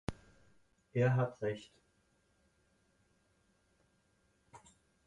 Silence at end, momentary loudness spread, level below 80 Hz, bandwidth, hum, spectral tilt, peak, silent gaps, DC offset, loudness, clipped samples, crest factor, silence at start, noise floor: 0.5 s; 15 LU; -64 dBFS; 10.5 kHz; none; -8 dB/octave; -20 dBFS; none; under 0.1%; -36 LUFS; under 0.1%; 22 dB; 0.1 s; -75 dBFS